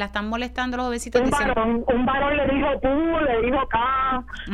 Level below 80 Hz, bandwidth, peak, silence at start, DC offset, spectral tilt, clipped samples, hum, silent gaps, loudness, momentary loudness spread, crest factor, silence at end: -36 dBFS; 13.5 kHz; -4 dBFS; 0 s; under 0.1%; -5 dB/octave; under 0.1%; none; none; -22 LUFS; 5 LU; 18 dB; 0 s